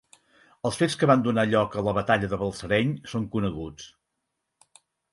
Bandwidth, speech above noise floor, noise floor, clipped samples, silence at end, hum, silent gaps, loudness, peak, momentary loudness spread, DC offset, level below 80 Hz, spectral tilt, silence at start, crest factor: 11.5 kHz; 56 dB; -81 dBFS; under 0.1%; 1.25 s; none; none; -25 LUFS; -6 dBFS; 14 LU; under 0.1%; -52 dBFS; -6 dB/octave; 0.65 s; 20 dB